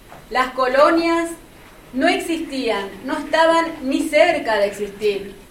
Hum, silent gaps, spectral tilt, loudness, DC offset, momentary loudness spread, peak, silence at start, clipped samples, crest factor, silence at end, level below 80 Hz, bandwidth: none; none; -3.5 dB/octave; -19 LUFS; under 0.1%; 11 LU; -2 dBFS; 0.1 s; under 0.1%; 18 dB; 0.1 s; -48 dBFS; 16.5 kHz